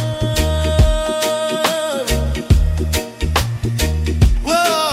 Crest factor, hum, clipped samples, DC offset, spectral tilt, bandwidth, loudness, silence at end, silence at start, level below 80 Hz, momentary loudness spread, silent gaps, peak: 14 dB; none; under 0.1%; under 0.1%; -5 dB/octave; 16 kHz; -17 LUFS; 0 s; 0 s; -20 dBFS; 4 LU; none; -2 dBFS